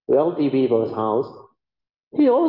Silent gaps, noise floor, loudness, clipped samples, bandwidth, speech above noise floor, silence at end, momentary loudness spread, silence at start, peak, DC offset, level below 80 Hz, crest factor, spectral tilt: 1.99-2.11 s; -88 dBFS; -21 LUFS; under 0.1%; 5.4 kHz; 69 dB; 0 s; 8 LU; 0.1 s; -8 dBFS; under 0.1%; -68 dBFS; 14 dB; -11 dB/octave